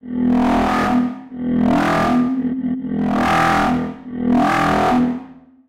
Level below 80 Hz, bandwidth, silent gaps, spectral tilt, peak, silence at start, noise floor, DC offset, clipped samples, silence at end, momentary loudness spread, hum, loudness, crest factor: -40 dBFS; 14 kHz; none; -6.5 dB/octave; -6 dBFS; 0.05 s; -40 dBFS; under 0.1%; under 0.1%; 0.3 s; 7 LU; none; -17 LUFS; 12 dB